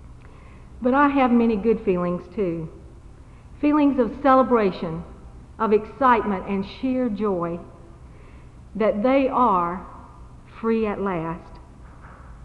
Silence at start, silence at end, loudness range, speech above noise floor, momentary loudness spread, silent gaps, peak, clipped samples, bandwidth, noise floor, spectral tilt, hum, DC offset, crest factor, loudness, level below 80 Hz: 0 s; 0 s; 3 LU; 23 dB; 14 LU; none; -4 dBFS; under 0.1%; 6.2 kHz; -44 dBFS; -8.5 dB/octave; none; under 0.1%; 18 dB; -22 LUFS; -46 dBFS